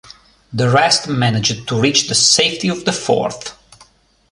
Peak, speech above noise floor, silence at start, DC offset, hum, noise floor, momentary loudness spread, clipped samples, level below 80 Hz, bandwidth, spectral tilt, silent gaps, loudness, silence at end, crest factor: 0 dBFS; 36 dB; 0.5 s; under 0.1%; none; -51 dBFS; 12 LU; under 0.1%; -52 dBFS; 11.5 kHz; -3 dB/octave; none; -14 LUFS; 0.8 s; 18 dB